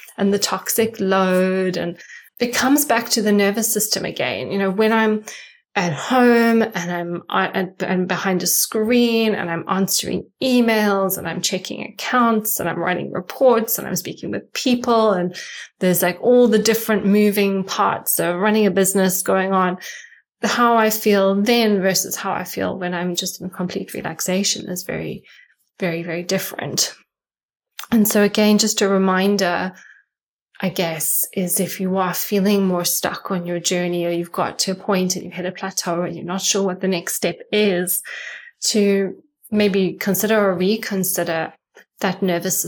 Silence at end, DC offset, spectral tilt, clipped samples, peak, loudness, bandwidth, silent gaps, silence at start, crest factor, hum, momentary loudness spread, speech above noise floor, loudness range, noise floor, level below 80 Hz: 0 s; under 0.1%; -4 dB/octave; under 0.1%; -4 dBFS; -19 LUFS; 19 kHz; 27.43-27.49 s, 30.23-30.46 s; 0.1 s; 16 dB; none; 10 LU; over 71 dB; 4 LU; under -90 dBFS; -62 dBFS